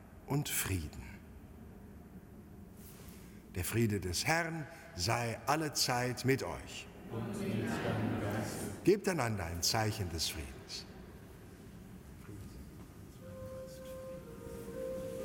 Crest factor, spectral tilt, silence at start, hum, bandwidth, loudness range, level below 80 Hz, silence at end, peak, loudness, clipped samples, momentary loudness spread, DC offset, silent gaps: 22 dB; -4 dB/octave; 0 s; none; 17 kHz; 14 LU; -56 dBFS; 0 s; -16 dBFS; -36 LUFS; under 0.1%; 21 LU; under 0.1%; none